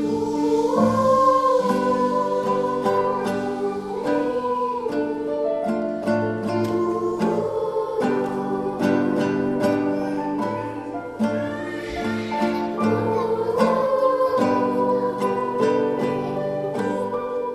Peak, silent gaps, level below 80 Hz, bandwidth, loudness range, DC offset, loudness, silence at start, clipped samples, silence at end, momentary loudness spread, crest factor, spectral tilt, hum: -6 dBFS; none; -54 dBFS; 13.5 kHz; 4 LU; under 0.1%; -22 LUFS; 0 s; under 0.1%; 0 s; 6 LU; 16 dB; -7 dB/octave; none